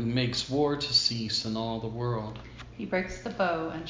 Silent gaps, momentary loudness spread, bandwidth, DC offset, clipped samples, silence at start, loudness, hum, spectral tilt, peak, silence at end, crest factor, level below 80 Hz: none; 15 LU; 7.6 kHz; under 0.1%; under 0.1%; 0 s; -29 LUFS; none; -4.5 dB/octave; -12 dBFS; 0 s; 18 dB; -52 dBFS